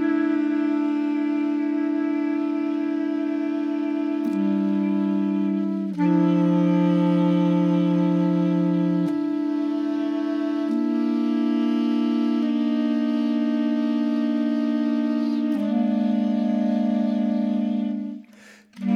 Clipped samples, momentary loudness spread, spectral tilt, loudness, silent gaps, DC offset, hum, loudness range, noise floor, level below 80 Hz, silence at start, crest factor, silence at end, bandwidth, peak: under 0.1%; 5 LU; -9 dB/octave; -23 LUFS; none; under 0.1%; none; 3 LU; -49 dBFS; -80 dBFS; 0 s; 12 dB; 0 s; 6.6 kHz; -10 dBFS